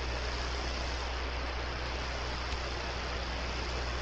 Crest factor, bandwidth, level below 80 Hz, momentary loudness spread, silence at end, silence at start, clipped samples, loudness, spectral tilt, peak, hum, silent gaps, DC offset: 14 dB; 8.4 kHz; -38 dBFS; 1 LU; 0 s; 0 s; under 0.1%; -36 LUFS; -4 dB/octave; -22 dBFS; none; none; under 0.1%